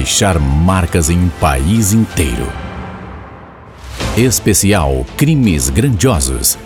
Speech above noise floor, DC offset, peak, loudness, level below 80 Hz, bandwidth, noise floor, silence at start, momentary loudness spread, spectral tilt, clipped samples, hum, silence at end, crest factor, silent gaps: 22 dB; under 0.1%; 0 dBFS; -13 LUFS; -24 dBFS; over 20 kHz; -34 dBFS; 0 s; 16 LU; -4.5 dB/octave; under 0.1%; none; 0 s; 14 dB; none